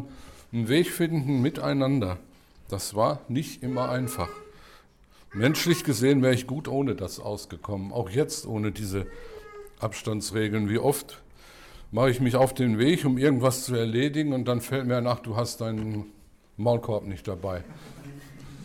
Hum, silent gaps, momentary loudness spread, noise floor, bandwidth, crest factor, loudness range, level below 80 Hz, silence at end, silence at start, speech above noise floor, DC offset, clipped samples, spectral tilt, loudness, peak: none; none; 17 LU; -55 dBFS; 18 kHz; 16 dB; 6 LU; -52 dBFS; 0 s; 0 s; 29 dB; under 0.1%; under 0.1%; -5.5 dB/octave; -27 LUFS; -12 dBFS